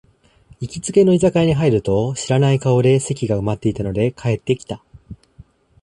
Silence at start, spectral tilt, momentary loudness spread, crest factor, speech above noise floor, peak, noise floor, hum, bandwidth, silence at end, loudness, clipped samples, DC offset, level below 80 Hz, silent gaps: 0.6 s; -6.5 dB/octave; 11 LU; 16 dB; 33 dB; -2 dBFS; -50 dBFS; none; 11 kHz; 0.7 s; -18 LUFS; under 0.1%; under 0.1%; -44 dBFS; none